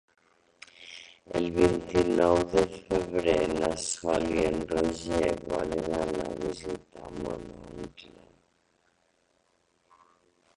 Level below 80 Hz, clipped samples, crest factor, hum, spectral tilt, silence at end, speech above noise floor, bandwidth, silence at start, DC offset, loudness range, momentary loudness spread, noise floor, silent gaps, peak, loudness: -50 dBFS; under 0.1%; 22 dB; none; -5 dB/octave; 2.5 s; 43 dB; 11.5 kHz; 0.8 s; under 0.1%; 16 LU; 19 LU; -71 dBFS; none; -8 dBFS; -28 LUFS